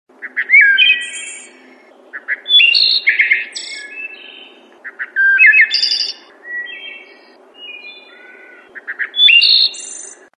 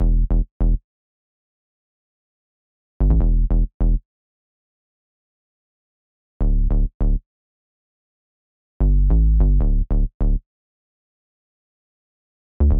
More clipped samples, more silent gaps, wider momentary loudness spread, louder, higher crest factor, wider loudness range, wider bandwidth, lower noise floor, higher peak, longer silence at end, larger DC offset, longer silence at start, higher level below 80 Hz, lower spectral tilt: neither; second, none vs 0.51-0.60 s, 0.84-3.00 s, 3.74-3.80 s, 4.05-6.40 s, 6.94-7.00 s, 7.26-8.80 s, 10.14-10.20 s, 10.46-12.60 s; first, 24 LU vs 7 LU; first, -9 LUFS vs -22 LUFS; about the same, 16 dB vs 14 dB; about the same, 7 LU vs 6 LU; first, 11 kHz vs 1.6 kHz; second, -44 dBFS vs under -90 dBFS; first, 0 dBFS vs -6 dBFS; first, 0.3 s vs 0 s; neither; first, 0.2 s vs 0 s; second, under -90 dBFS vs -20 dBFS; second, 4.5 dB/octave vs -13 dB/octave